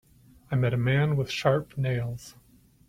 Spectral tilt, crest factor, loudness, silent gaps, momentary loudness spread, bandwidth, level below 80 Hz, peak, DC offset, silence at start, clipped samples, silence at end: -7 dB/octave; 18 dB; -27 LUFS; none; 8 LU; 15 kHz; -56 dBFS; -10 dBFS; under 0.1%; 0.5 s; under 0.1%; 0.6 s